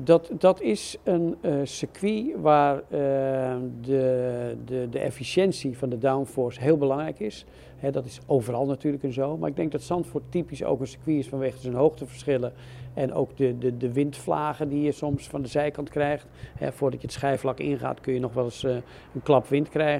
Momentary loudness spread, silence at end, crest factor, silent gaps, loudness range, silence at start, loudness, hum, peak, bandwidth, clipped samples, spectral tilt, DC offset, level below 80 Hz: 9 LU; 0 s; 20 dB; none; 3 LU; 0 s; -27 LUFS; none; -4 dBFS; 14 kHz; under 0.1%; -6.5 dB/octave; under 0.1%; -54 dBFS